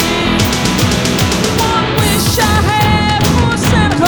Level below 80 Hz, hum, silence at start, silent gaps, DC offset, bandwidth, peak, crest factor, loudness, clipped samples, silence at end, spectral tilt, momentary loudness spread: -24 dBFS; none; 0 s; none; under 0.1%; over 20 kHz; 0 dBFS; 12 dB; -12 LUFS; under 0.1%; 0 s; -4.5 dB/octave; 1 LU